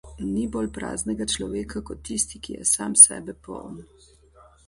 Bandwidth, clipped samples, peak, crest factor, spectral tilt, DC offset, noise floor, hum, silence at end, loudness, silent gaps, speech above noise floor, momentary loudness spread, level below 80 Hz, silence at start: 11.5 kHz; under 0.1%; 0 dBFS; 24 dB; -2 dB/octave; under 0.1%; -54 dBFS; none; 0.85 s; -20 LUFS; none; 30 dB; 25 LU; -46 dBFS; 0.05 s